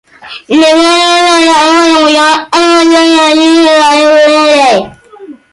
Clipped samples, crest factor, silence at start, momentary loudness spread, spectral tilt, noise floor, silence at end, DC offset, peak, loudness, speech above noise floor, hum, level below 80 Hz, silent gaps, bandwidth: under 0.1%; 6 dB; 0.25 s; 4 LU; -2 dB/octave; -30 dBFS; 0.2 s; under 0.1%; 0 dBFS; -5 LUFS; 25 dB; none; -48 dBFS; none; 11.5 kHz